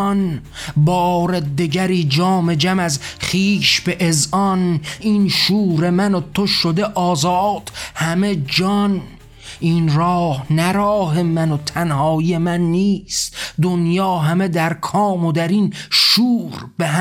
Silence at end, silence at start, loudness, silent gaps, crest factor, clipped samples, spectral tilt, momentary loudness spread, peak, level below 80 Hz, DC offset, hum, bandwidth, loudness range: 0 s; 0 s; -17 LUFS; none; 14 dB; under 0.1%; -5 dB/octave; 6 LU; -4 dBFS; -44 dBFS; under 0.1%; none; 16.5 kHz; 2 LU